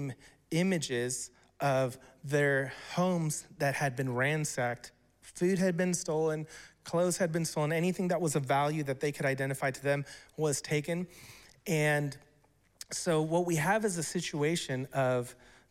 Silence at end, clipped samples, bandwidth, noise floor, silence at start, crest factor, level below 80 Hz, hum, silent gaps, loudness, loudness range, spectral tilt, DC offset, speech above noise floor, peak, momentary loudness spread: 0.35 s; under 0.1%; 16.5 kHz; -68 dBFS; 0 s; 16 dB; -68 dBFS; none; none; -32 LUFS; 2 LU; -5 dB/octave; under 0.1%; 36 dB; -16 dBFS; 14 LU